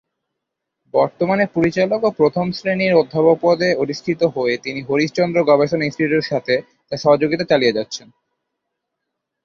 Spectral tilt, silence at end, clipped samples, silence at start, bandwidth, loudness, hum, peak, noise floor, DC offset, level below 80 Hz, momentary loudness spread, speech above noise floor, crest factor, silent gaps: -6 dB/octave; 1.45 s; under 0.1%; 0.95 s; 7.4 kHz; -18 LUFS; none; -2 dBFS; -79 dBFS; under 0.1%; -58 dBFS; 7 LU; 62 dB; 16 dB; none